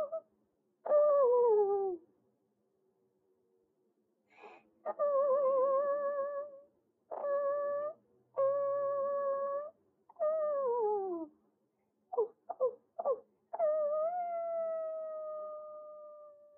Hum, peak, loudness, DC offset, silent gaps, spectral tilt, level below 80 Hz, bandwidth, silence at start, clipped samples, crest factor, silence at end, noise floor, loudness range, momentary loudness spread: none; -20 dBFS; -34 LUFS; under 0.1%; none; -6 dB/octave; under -90 dBFS; 2.8 kHz; 0 s; under 0.1%; 16 dB; 0.25 s; -79 dBFS; 5 LU; 18 LU